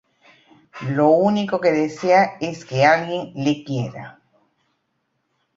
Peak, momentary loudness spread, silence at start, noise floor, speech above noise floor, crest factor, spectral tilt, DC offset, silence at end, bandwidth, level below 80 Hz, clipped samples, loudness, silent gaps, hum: -2 dBFS; 14 LU; 0.75 s; -72 dBFS; 53 dB; 20 dB; -6.5 dB/octave; under 0.1%; 1.45 s; 7.8 kHz; -62 dBFS; under 0.1%; -19 LUFS; none; none